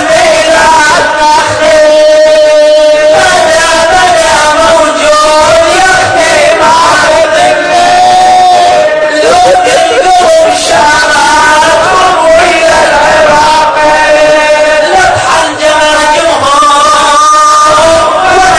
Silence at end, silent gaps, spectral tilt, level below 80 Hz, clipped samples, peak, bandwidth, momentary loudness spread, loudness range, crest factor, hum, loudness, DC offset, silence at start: 0 s; none; -2 dB/octave; -32 dBFS; 10%; 0 dBFS; 11 kHz; 2 LU; 1 LU; 4 dB; none; -4 LUFS; under 0.1%; 0 s